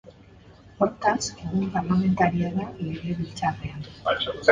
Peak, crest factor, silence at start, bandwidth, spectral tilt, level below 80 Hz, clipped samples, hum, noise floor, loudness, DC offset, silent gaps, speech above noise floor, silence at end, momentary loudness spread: -2 dBFS; 24 dB; 0.05 s; 9.4 kHz; -5.5 dB/octave; -50 dBFS; under 0.1%; none; -50 dBFS; -26 LUFS; under 0.1%; none; 26 dB; 0 s; 9 LU